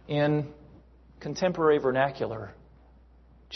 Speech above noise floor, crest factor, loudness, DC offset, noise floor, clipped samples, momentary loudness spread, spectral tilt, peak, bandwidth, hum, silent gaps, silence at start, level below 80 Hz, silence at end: 29 dB; 18 dB; -27 LUFS; under 0.1%; -56 dBFS; under 0.1%; 17 LU; -6.5 dB/octave; -10 dBFS; 6.4 kHz; none; none; 0.1 s; -56 dBFS; 0 s